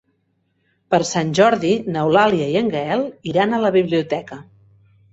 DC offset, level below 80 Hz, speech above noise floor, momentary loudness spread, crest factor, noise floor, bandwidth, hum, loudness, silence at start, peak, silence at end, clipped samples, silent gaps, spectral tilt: under 0.1%; -58 dBFS; 49 dB; 8 LU; 18 dB; -67 dBFS; 8 kHz; none; -18 LUFS; 0.9 s; -2 dBFS; 0.7 s; under 0.1%; none; -5.5 dB/octave